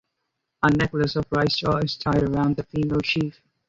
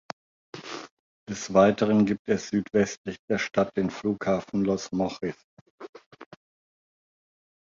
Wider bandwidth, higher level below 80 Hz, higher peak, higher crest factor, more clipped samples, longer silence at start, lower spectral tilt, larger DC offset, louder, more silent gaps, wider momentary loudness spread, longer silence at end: about the same, 7.8 kHz vs 7.6 kHz; first, -46 dBFS vs -60 dBFS; about the same, -6 dBFS vs -6 dBFS; about the same, 18 dB vs 22 dB; neither; about the same, 0.6 s vs 0.55 s; about the same, -6.5 dB/octave vs -6 dB/octave; neither; first, -23 LUFS vs -26 LUFS; second, none vs 0.91-1.26 s, 2.19-2.25 s, 2.97-3.04 s, 3.19-3.28 s, 5.44-5.78 s, 5.89-5.93 s, 6.06-6.11 s; second, 4 LU vs 24 LU; second, 0.4 s vs 1.5 s